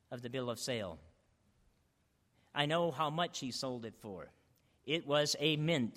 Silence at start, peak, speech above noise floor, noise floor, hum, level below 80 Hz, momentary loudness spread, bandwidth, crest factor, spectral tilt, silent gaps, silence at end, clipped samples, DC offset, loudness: 0.1 s; -16 dBFS; 40 dB; -76 dBFS; none; -72 dBFS; 17 LU; 16 kHz; 22 dB; -4 dB/octave; none; 0 s; under 0.1%; under 0.1%; -36 LUFS